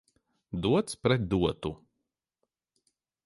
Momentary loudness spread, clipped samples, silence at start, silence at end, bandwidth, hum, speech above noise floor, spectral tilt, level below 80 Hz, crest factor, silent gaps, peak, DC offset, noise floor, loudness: 12 LU; under 0.1%; 0.5 s; 1.5 s; 11.5 kHz; none; 57 dB; -6 dB/octave; -52 dBFS; 20 dB; none; -12 dBFS; under 0.1%; -85 dBFS; -29 LUFS